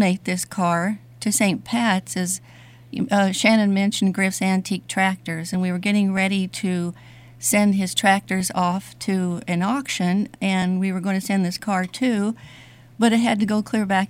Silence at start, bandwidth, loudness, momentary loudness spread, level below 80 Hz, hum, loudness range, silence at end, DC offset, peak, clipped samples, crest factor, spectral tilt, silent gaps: 0 s; 16 kHz; -21 LUFS; 8 LU; -62 dBFS; none; 2 LU; 0.05 s; under 0.1%; -4 dBFS; under 0.1%; 18 dB; -4.5 dB/octave; none